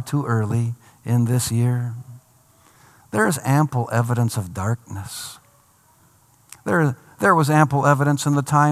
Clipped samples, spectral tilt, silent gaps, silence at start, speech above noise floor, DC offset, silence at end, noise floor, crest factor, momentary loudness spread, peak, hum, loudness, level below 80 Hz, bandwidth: under 0.1%; -6 dB/octave; none; 0 s; 37 dB; under 0.1%; 0 s; -56 dBFS; 20 dB; 14 LU; -2 dBFS; none; -20 LUFS; -60 dBFS; 15 kHz